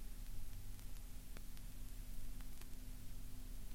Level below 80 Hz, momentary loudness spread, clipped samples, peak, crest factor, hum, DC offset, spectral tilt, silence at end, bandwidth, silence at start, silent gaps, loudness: -50 dBFS; 1 LU; under 0.1%; -32 dBFS; 12 dB; none; under 0.1%; -4 dB/octave; 0 s; 17 kHz; 0 s; none; -56 LUFS